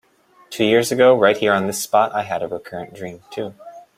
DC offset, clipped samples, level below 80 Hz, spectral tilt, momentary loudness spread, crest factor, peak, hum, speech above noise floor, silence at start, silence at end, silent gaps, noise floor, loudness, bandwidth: under 0.1%; under 0.1%; -62 dBFS; -4 dB/octave; 19 LU; 18 dB; -2 dBFS; none; 34 dB; 0.5 s; 0.15 s; none; -52 dBFS; -17 LUFS; 16 kHz